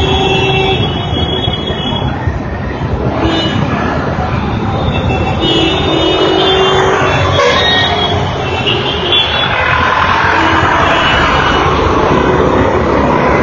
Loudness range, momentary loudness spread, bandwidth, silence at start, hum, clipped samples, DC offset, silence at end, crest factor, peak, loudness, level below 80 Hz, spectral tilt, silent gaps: 5 LU; 6 LU; 7.4 kHz; 0 s; none; under 0.1%; under 0.1%; 0 s; 12 dB; 0 dBFS; -11 LUFS; -24 dBFS; -5.5 dB/octave; none